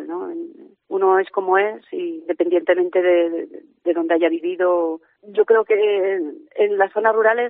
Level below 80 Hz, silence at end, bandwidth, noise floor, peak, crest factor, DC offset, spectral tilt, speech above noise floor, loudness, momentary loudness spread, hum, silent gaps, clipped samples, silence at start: -82 dBFS; 0 s; 4 kHz; -38 dBFS; -4 dBFS; 16 dB; under 0.1%; -2 dB/octave; 20 dB; -19 LUFS; 12 LU; none; none; under 0.1%; 0 s